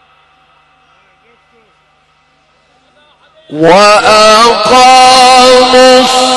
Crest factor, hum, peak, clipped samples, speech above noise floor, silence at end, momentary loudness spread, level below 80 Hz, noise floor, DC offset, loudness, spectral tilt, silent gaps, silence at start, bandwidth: 8 dB; none; 0 dBFS; 3%; 46 dB; 0 s; 4 LU; -40 dBFS; -50 dBFS; under 0.1%; -3 LUFS; -2 dB/octave; none; 3.5 s; 14 kHz